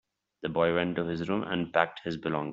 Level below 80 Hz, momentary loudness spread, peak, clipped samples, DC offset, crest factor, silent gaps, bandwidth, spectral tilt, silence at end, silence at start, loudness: -64 dBFS; 7 LU; -6 dBFS; under 0.1%; under 0.1%; 24 dB; none; 7.6 kHz; -4.5 dB/octave; 0 s; 0.4 s; -30 LUFS